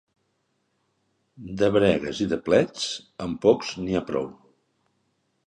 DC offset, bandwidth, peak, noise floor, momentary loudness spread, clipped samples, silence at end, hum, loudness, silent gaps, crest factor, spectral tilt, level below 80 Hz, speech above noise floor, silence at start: under 0.1%; 10.5 kHz; -6 dBFS; -73 dBFS; 12 LU; under 0.1%; 1.15 s; none; -24 LUFS; none; 20 dB; -5.5 dB/octave; -54 dBFS; 49 dB; 1.4 s